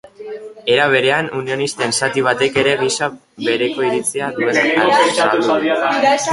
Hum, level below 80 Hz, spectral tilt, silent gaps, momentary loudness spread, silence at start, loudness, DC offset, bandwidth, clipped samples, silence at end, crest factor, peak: none; -58 dBFS; -3 dB/octave; none; 9 LU; 0.2 s; -16 LUFS; under 0.1%; 11.5 kHz; under 0.1%; 0 s; 14 dB; -2 dBFS